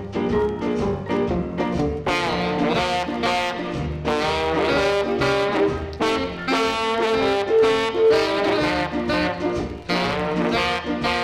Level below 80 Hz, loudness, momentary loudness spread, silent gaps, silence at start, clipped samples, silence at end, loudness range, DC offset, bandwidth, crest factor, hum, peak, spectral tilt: -40 dBFS; -21 LUFS; 6 LU; none; 0 s; under 0.1%; 0 s; 3 LU; under 0.1%; 14.5 kHz; 12 dB; none; -10 dBFS; -5.5 dB/octave